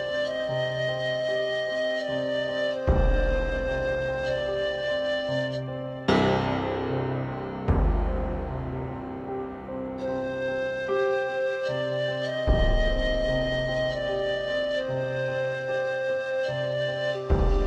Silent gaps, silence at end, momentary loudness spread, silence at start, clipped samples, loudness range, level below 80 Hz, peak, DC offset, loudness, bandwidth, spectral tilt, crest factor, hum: none; 0 s; 7 LU; 0 s; under 0.1%; 3 LU; -32 dBFS; -10 dBFS; under 0.1%; -27 LUFS; 8.6 kHz; -6.5 dB/octave; 18 dB; none